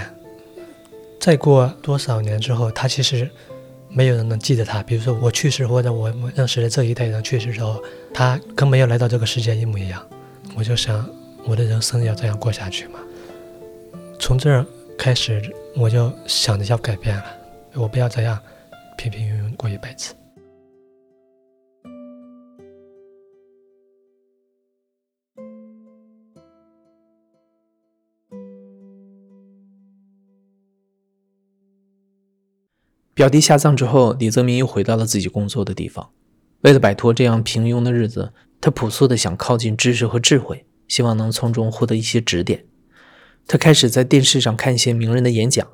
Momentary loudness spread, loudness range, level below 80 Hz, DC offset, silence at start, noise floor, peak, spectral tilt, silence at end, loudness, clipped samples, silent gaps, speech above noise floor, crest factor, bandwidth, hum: 18 LU; 8 LU; -46 dBFS; under 0.1%; 0 s; -79 dBFS; -2 dBFS; -5 dB/octave; 0.05 s; -18 LUFS; under 0.1%; none; 62 dB; 18 dB; 16 kHz; none